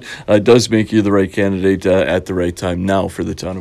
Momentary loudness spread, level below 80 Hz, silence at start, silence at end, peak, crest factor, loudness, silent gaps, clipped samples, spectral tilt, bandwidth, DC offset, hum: 9 LU; -42 dBFS; 0 s; 0 s; 0 dBFS; 14 dB; -15 LUFS; none; under 0.1%; -6 dB/octave; 13.5 kHz; under 0.1%; none